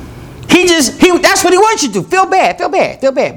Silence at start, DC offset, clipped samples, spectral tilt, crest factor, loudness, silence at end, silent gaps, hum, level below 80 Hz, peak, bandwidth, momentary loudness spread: 0 s; under 0.1%; 0.7%; -3 dB/octave; 10 dB; -10 LUFS; 0 s; none; none; -40 dBFS; 0 dBFS; 19.5 kHz; 6 LU